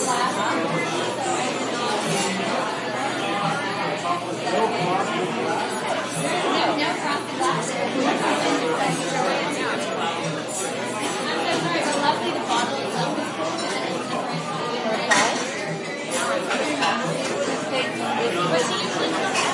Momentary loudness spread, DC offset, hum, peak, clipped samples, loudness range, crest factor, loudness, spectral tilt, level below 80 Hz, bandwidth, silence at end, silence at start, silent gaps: 5 LU; under 0.1%; none; -4 dBFS; under 0.1%; 1 LU; 18 dB; -23 LUFS; -3.5 dB/octave; -72 dBFS; 11.5 kHz; 0 s; 0 s; none